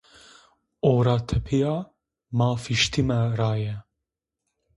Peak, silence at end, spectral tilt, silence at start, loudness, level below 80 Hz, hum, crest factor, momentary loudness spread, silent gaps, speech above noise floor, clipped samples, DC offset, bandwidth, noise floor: -8 dBFS; 0.95 s; -6 dB/octave; 0.85 s; -24 LUFS; -44 dBFS; none; 18 dB; 10 LU; none; 62 dB; under 0.1%; under 0.1%; 11.5 kHz; -85 dBFS